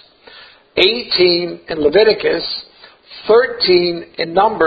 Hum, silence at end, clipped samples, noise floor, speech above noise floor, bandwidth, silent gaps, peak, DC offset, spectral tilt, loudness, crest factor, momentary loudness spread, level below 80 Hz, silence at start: none; 0 s; under 0.1%; -42 dBFS; 28 dB; 7.6 kHz; none; 0 dBFS; under 0.1%; -6.5 dB/octave; -14 LUFS; 16 dB; 11 LU; -48 dBFS; 0.35 s